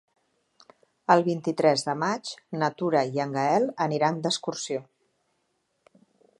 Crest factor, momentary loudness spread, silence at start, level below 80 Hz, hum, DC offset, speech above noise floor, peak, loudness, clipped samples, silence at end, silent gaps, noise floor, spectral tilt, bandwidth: 22 dB; 11 LU; 1.1 s; -78 dBFS; none; under 0.1%; 49 dB; -4 dBFS; -26 LUFS; under 0.1%; 1.6 s; none; -74 dBFS; -5 dB/octave; 11.5 kHz